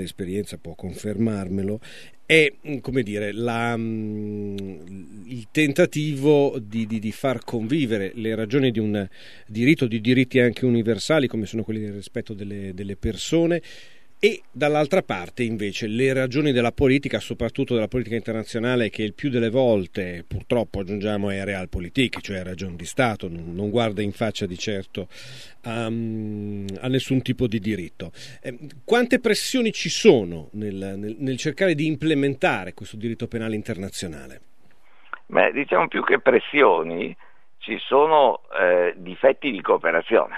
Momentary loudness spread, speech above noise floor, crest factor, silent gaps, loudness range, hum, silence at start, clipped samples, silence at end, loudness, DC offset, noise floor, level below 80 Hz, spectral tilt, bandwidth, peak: 14 LU; 37 dB; 22 dB; none; 6 LU; none; 0 s; under 0.1%; 0 s; -23 LUFS; 0.7%; -59 dBFS; -48 dBFS; -5.5 dB/octave; 13.5 kHz; 0 dBFS